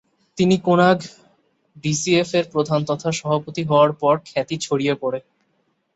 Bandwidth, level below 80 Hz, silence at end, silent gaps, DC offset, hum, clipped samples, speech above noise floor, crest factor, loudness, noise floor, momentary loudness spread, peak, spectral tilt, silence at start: 8.2 kHz; -60 dBFS; 0.75 s; none; under 0.1%; none; under 0.1%; 48 dB; 18 dB; -20 LUFS; -68 dBFS; 10 LU; -2 dBFS; -5.5 dB/octave; 0.35 s